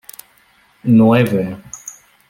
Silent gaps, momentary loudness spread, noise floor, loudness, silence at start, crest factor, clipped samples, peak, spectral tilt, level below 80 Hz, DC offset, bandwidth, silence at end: none; 23 LU; -53 dBFS; -14 LUFS; 0.85 s; 16 dB; under 0.1%; -2 dBFS; -7 dB/octave; -54 dBFS; under 0.1%; 17 kHz; 0.4 s